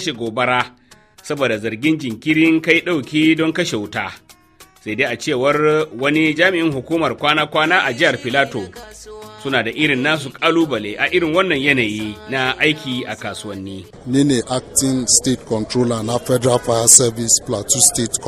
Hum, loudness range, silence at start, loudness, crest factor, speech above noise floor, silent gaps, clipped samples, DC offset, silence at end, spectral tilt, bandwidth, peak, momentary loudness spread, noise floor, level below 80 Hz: none; 4 LU; 0 s; -16 LUFS; 18 dB; 30 dB; none; under 0.1%; under 0.1%; 0 s; -3 dB/octave; 15.5 kHz; 0 dBFS; 14 LU; -48 dBFS; -50 dBFS